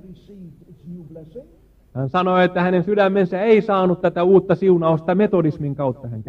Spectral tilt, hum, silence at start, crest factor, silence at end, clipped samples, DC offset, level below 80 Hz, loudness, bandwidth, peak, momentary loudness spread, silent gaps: -9.5 dB/octave; none; 0.05 s; 16 dB; 0.05 s; under 0.1%; under 0.1%; -52 dBFS; -18 LUFS; 5.8 kHz; -2 dBFS; 22 LU; none